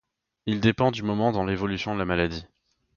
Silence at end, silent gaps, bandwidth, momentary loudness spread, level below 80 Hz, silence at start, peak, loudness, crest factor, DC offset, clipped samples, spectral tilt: 0.5 s; none; 7.2 kHz; 8 LU; -46 dBFS; 0.45 s; -6 dBFS; -25 LUFS; 20 dB; under 0.1%; under 0.1%; -7 dB/octave